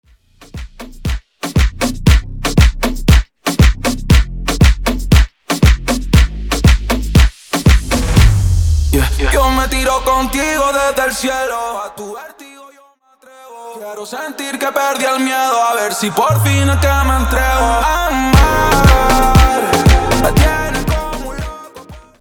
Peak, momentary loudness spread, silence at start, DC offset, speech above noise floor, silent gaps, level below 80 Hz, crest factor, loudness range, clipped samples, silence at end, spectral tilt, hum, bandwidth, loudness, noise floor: 0 dBFS; 14 LU; 0.55 s; under 0.1%; 34 dB; none; -16 dBFS; 12 dB; 8 LU; under 0.1%; 0.2 s; -5 dB/octave; none; 20 kHz; -13 LUFS; -49 dBFS